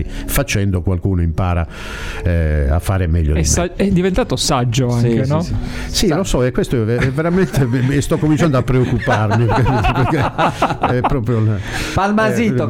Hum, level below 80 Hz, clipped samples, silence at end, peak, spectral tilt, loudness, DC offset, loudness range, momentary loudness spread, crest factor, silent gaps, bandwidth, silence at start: none; -26 dBFS; under 0.1%; 0 s; -2 dBFS; -5.5 dB/octave; -16 LUFS; under 0.1%; 2 LU; 5 LU; 12 dB; none; 16.5 kHz; 0 s